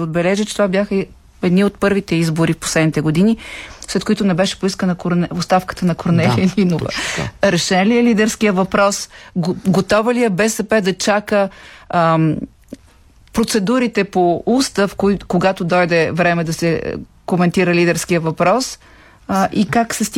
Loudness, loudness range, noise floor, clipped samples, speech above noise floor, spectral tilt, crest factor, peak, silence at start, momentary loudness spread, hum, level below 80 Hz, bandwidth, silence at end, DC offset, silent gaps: -16 LUFS; 2 LU; -47 dBFS; under 0.1%; 31 dB; -5.5 dB/octave; 14 dB; -2 dBFS; 0 s; 8 LU; none; -44 dBFS; 16 kHz; 0 s; under 0.1%; none